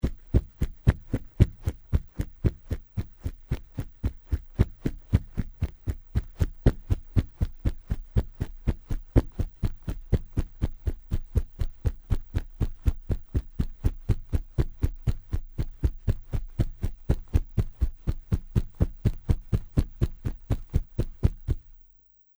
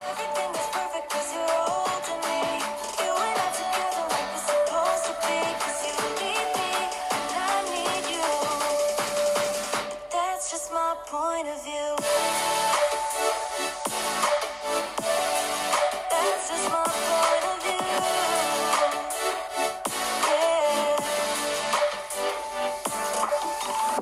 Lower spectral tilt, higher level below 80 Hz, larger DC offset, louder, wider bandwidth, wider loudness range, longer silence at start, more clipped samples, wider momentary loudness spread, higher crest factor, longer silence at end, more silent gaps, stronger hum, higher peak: first, -8.5 dB/octave vs -1 dB/octave; first, -30 dBFS vs -62 dBFS; neither; second, -31 LUFS vs -26 LUFS; first, over 20 kHz vs 16 kHz; about the same, 3 LU vs 2 LU; about the same, 0.05 s vs 0 s; neither; first, 9 LU vs 5 LU; first, 24 dB vs 16 dB; first, 0.65 s vs 0 s; neither; neither; first, -4 dBFS vs -10 dBFS